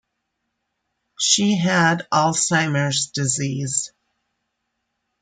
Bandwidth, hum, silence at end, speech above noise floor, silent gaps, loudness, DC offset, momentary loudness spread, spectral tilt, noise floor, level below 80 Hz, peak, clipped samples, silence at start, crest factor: 9.8 kHz; none; 1.35 s; 57 dB; none; -19 LUFS; under 0.1%; 6 LU; -3 dB/octave; -76 dBFS; -64 dBFS; -4 dBFS; under 0.1%; 1.2 s; 20 dB